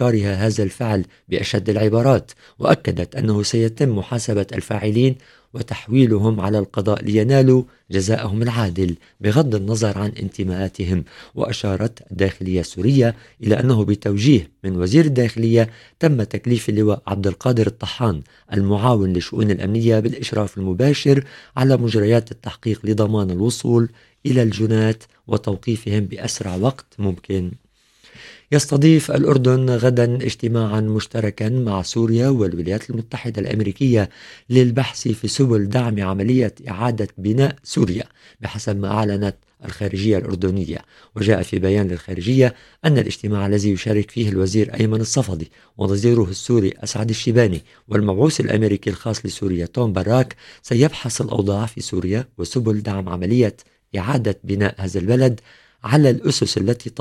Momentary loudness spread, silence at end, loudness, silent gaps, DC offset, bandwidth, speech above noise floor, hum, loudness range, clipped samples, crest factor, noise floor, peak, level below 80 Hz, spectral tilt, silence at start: 9 LU; 0 s; -19 LUFS; none; under 0.1%; 13 kHz; 35 dB; none; 4 LU; under 0.1%; 18 dB; -53 dBFS; 0 dBFS; -46 dBFS; -6.5 dB/octave; 0 s